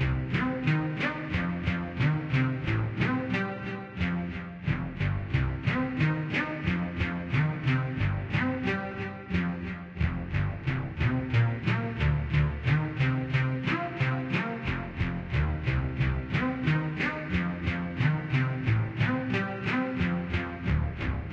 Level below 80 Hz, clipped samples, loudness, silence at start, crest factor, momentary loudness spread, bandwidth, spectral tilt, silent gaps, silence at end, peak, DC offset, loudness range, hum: -40 dBFS; under 0.1%; -29 LUFS; 0 s; 16 dB; 5 LU; 7 kHz; -8 dB/octave; none; 0 s; -14 dBFS; under 0.1%; 2 LU; none